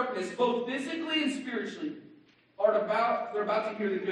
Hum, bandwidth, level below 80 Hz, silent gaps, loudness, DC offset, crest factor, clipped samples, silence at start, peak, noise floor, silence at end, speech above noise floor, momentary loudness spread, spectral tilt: none; 11.5 kHz; -84 dBFS; none; -30 LUFS; under 0.1%; 18 dB; under 0.1%; 0 s; -12 dBFS; -59 dBFS; 0 s; 29 dB; 9 LU; -4.5 dB/octave